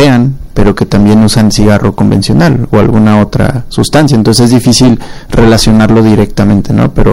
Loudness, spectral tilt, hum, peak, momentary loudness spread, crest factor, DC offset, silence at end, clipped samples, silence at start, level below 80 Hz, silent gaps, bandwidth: -7 LUFS; -6 dB/octave; none; 0 dBFS; 5 LU; 6 dB; under 0.1%; 0 s; 3%; 0 s; -18 dBFS; none; 16.5 kHz